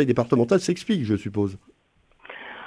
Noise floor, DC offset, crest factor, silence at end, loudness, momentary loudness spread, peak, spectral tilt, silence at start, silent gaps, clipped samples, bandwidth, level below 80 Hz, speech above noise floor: -62 dBFS; under 0.1%; 20 dB; 0 s; -23 LUFS; 19 LU; -6 dBFS; -6.5 dB/octave; 0 s; none; under 0.1%; 11 kHz; -58 dBFS; 40 dB